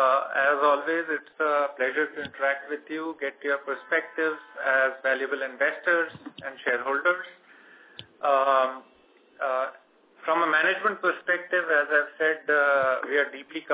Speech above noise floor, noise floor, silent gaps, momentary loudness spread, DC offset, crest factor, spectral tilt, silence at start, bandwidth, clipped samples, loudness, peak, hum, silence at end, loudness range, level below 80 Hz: 31 dB; -57 dBFS; none; 11 LU; under 0.1%; 16 dB; -6.5 dB/octave; 0 s; 4 kHz; under 0.1%; -25 LUFS; -10 dBFS; none; 0 s; 4 LU; -78 dBFS